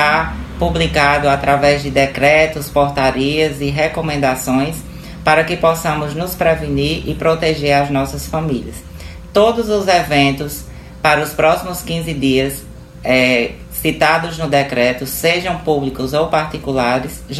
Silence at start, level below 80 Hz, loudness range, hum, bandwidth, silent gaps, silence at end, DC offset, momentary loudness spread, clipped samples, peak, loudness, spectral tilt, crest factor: 0 s; -34 dBFS; 3 LU; none; 14.5 kHz; none; 0 s; under 0.1%; 9 LU; under 0.1%; 0 dBFS; -15 LUFS; -5 dB/octave; 16 dB